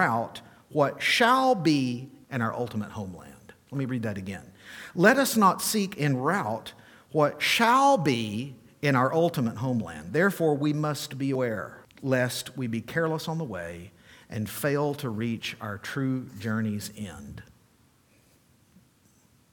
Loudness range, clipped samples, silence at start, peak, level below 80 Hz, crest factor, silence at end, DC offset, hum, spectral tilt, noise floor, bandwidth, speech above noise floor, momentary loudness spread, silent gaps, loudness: 9 LU; under 0.1%; 0 s; -4 dBFS; -64 dBFS; 24 dB; 2.1 s; under 0.1%; none; -5 dB/octave; -62 dBFS; 19 kHz; 36 dB; 18 LU; none; -26 LUFS